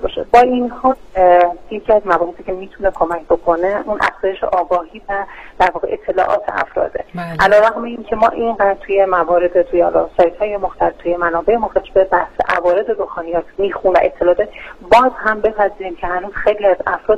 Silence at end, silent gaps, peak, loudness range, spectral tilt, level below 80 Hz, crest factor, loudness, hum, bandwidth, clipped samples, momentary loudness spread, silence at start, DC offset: 0 s; none; 0 dBFS; 3 LU; -6 dB/octave; -38 dBFS; 14 dB; -15 LUFS; none; 9.2 kHz; under 0.1%; 10 LU; 0 s; 0.2%